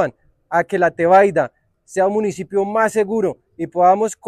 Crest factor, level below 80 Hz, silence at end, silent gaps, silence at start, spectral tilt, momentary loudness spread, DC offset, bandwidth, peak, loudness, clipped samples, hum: 16 dB; -60 dBFS; 0 s; none; 0 s; -6 dB/octave; 12 LU; under 0.1%; 13.5 kHz; -2 dBFS; -17 LUFS; under 0.1%; none